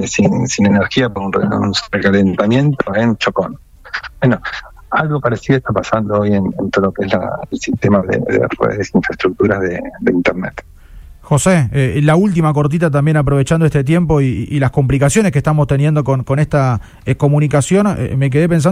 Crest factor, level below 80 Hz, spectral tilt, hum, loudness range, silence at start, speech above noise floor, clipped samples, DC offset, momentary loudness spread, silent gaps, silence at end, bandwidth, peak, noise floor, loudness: 14 dB; -36 dBFS; -6.5 dB/octave; none; 3 LU; 0 s; 23 dB; under 0.1%; under 0.1%; 6 LU; none; 0 s; 13.5 kHz; 0 dBFS; -36 dBFS; -14 LUFS